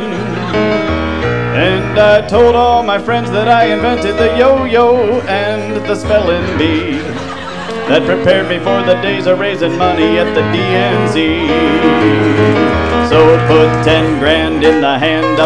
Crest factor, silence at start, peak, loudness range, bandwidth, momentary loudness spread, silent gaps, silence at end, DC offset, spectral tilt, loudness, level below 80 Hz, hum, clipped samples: 10 dB; 0 s; 0 dBFS; 4 LU; 10 kHz; 7 LU; none; 0 s; 2%; -6.5 dB/octave; -11 LUFS; -32 dBFS; none; under 0.1%